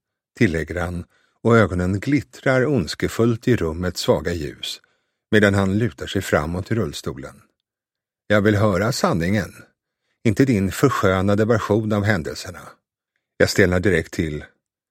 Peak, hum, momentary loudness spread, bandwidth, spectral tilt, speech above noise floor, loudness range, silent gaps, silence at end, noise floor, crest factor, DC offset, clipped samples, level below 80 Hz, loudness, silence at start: 0 dBFS; none; 13 LU; 16.5 kHz; -6 dB/octave; 69 dB; 2 LU; none; 0.45 s; -88 dBFS; 20 dB; under 0.1%; under 0.1%; -44 dBFS; -20 LUFS; 0.35 s